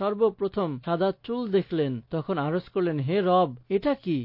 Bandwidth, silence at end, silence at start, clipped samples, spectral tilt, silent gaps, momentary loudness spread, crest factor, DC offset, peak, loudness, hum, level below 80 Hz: 5.6 kHz; 0 s; 0 s; under 0.1%; -10.5 dB/octave; none; 6 LU; 14 dB; under 0.1%; -12 dBFS; -27 LUFS; none; -60 dBFS